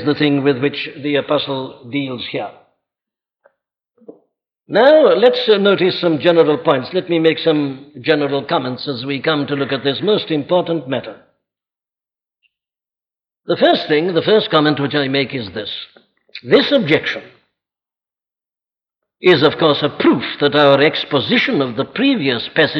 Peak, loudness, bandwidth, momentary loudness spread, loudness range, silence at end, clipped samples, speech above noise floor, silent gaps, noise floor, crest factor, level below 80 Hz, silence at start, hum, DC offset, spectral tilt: -2 dBFS; -15 LUFS; 6.2 kHz; 12 LU; 9 LU; 0 s; under 0.1%; over 75 dB; none; under -90 dBFS; 16 dB; -62 dBFS; 0 s; none; under 0.1%; -7.5 dB/octave